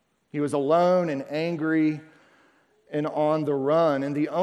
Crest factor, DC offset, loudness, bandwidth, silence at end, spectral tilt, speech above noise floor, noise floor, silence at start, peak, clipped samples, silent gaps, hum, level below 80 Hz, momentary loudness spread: 16 dB; under 0.1%; -24 LUFS; 11.5 kHz; 0 s; -7.5 dB/octave; 38 dB; -62 dBFS; 0.35 s; -8 dBFS; under 0.1%; none; none; -74 dBFS; 9 LU